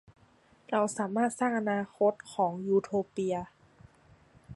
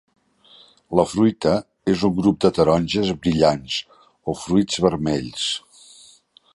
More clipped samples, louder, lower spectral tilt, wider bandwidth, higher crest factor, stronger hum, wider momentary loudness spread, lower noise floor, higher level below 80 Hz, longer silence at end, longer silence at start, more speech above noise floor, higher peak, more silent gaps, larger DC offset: neither; second, -30 LUFS vs -20 LUFS; about the same, -6 dB/octave vs -5.5 dB/octave; about the same, 11.5 kHz vs 11.5 kHz; about the same, 18 dB vs 20 dB; neither; second, 5 LU vs 9 LU; first, -63 dBFS vs -53 dBFS; second, -68 dBFS vs -46 dBFS; second, 0 s vs 0.95 s; second, 0.7 s vs 0.9 s; about the same, 33 dB vs 33 dB; second, -14 dBFS vs -2 dBFS; neither; neither